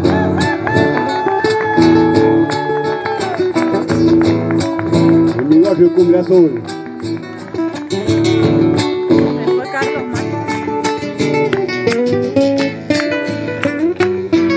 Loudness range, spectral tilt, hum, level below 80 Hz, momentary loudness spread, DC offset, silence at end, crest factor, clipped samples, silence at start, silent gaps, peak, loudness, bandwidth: 4 LU; -6.5 dB/octave; none; -40 dBFS; 9 LU; under 0.1%; 0 s; 14 dB; under 0.1%; 0 s; none; 0 dBFS; -14 LUFS; 8 kHz